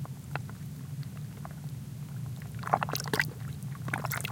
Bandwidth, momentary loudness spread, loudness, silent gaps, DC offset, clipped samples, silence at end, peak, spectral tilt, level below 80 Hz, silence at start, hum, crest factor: 17 kHz; 11 LU; -36 LUFS; none; under 0.1%; under 0.1%; 0 s; -8 dBFS; -4.5 dB/octave; -58 dBFS; 0 s; none; 28 dB